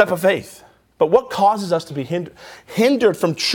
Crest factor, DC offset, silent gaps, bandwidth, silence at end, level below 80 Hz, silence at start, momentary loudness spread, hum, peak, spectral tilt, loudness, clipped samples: 18 dB; under 0.1%; none; 19.5 kHz; 0 s; -58 dBFS; 0 s; 10 LU; none; 0 dBFS; -5 dB/octave; -18 LUFS; under 0.1%